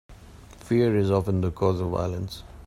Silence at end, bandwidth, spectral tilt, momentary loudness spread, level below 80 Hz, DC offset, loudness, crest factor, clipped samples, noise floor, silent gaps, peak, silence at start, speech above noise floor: 0 s; 13 kHz; -8 dB/octave; 9 LU; -48 dBFS; under 0.1%; -25 LUFS; 18 dB; under 0.1%; -47 dBFS; none; -8 dBFS; 0.1 s; 23 dB